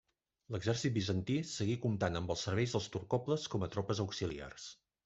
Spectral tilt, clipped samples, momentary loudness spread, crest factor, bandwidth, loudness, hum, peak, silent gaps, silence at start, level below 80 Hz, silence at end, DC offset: -5.5 dB/octave; under 0.1%; 9 LU; 18 dB; 8.2 kHz; -37 LUFS; none; -18 dBFS; none; 0.5 s; -64 dBFS; 0.3 s; under 0.1%